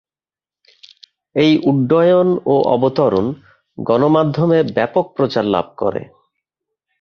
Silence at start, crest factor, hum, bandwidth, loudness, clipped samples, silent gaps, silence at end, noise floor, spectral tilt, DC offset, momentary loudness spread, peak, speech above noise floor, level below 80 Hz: 1.35 s; 14 dB; none; 6.6 kHz; -16 LUFS; under 0.1%; none; 0.95 s; under -90 dBFS; -8.5 dB/octave; under 0.1%; 9 LU; -2 dBFS; over 75 dB; -54 dBFS